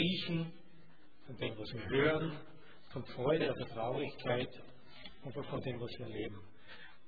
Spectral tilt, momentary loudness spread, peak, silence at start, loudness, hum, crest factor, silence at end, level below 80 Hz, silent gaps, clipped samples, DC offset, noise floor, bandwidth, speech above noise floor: -4.5 dB/octave; 21 LU; -18 dBFS; 0 s; -38 LUFS; none; 20 dB; 0.15 s; -64 dBFS; none; under 0.1%; 0.4%; -64 dBFS; 4.9 kHz; 26 dB